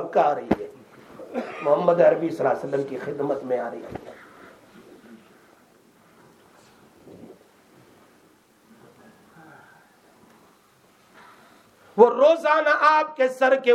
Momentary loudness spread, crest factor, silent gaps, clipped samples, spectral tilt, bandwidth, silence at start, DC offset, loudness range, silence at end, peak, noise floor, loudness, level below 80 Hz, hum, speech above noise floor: 18 LU; 24 dB; none; under 0.1%; -6 dB/octave; 13 kHz; 0 s; under 0.1%; 15 LU; 0 s; -2 dBFS; -58 dBFS; -21 LUFS; -64 dBFS; none; 37 dB